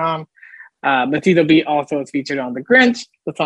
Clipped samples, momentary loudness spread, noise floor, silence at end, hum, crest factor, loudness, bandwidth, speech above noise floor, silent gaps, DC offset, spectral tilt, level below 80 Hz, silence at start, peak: under 0.1%; 12 LU; -43 dBFS; 0 s; none; 18 dB; -16 LUFS; 9.8 kHz; 26 dB; none; under 0.1%; -5.5 dB/octave; -62 dBFS; 0 s; 0 dBFS